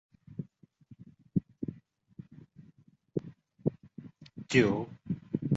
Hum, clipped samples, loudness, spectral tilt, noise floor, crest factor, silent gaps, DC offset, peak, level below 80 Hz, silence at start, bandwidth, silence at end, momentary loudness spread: none; under 0.1%; -34 LUFS; -6.5 dB/octave; -63 dBFS; 26 dB; none; under 0.1%; -10 dBFS; -64 dBFS; 0.3 s; 8 kHz; 0 s; 27 LU